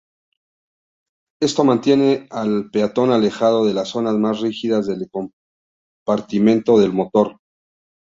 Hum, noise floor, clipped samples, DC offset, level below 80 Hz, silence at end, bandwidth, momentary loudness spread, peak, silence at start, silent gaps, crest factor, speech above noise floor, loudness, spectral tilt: none; under -90 dBFS; under 0.1%; under 0.1%; -60 dBFS; 0.7 s; 7.8 kHz; 9 LU; -2 dBFS; 1.4 s; 5.33-6.06 s; 16 dB; over 73 dB; -18 LUFS; -6.5 dB/octave